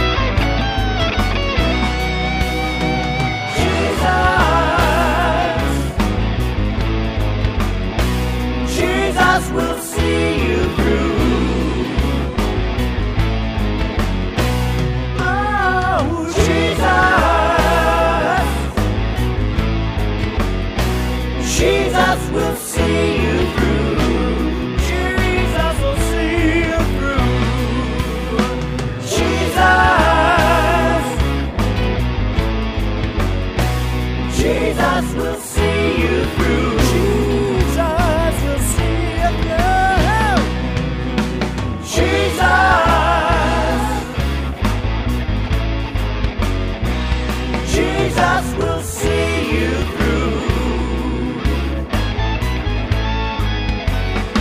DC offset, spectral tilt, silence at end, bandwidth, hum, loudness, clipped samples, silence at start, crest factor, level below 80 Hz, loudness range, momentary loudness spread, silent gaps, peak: under 0.1%; -5.5 dB/octave; 0 s; 16 kHz; none; -17 LUFS; under 0.1%; 0 s; 16 dB; -22 dBFS; 4 LU; 7 LU; none; 0 dBFS